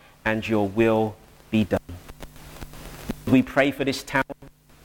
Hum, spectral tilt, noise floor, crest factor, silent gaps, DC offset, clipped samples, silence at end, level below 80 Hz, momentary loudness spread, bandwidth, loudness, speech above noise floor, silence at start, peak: none; -6 dB/octave; -50 dBFS; 20 dB; none; under 0.1%; under 0.1%; 0.35 s; -46 dBFS; 21 LU; 17.5 kHz; -24 LUFS; 28 dB; 0.25 s; -6 dBFS